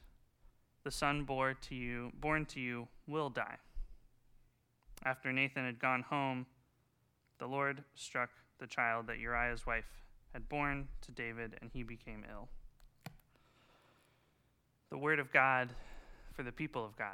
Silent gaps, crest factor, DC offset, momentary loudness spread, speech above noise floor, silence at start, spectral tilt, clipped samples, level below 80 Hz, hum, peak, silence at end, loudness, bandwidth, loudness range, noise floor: none; 28 dB; under 0.1%; 20 LU; 38 dB; 0 s; -5 dB/octave; under 0.1%; -54 dBFS; none; -14 dBFS; 0 s; -38 LUFS; 17.5 kHz; 10 LU; -77 dBFS